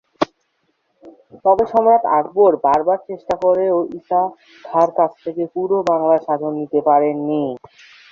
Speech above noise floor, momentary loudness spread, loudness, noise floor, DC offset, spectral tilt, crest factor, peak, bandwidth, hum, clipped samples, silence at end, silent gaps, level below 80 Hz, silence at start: 50 dB; 10 LU; -17 LUFS; -67 dBFS; under 0.1%; -7.5 dB/octave; 16 dB; -2 dBFS; 7.2 kHz; none; under 0.1%; 0.55 s; none; -58 dBFS; 0.2 s